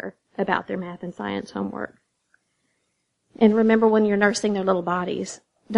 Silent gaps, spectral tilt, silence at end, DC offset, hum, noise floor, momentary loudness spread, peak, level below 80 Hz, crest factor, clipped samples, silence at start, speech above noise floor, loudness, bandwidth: none; -5.5 dB/octave; 0 s; under 0.1%; none; -74 dBFS; 16 LU; -4 dBFS; -66 dBFS; 20 dB; under 0.1%; 0.05 s; 52 dB; -22 LUFS; 10.5 kHz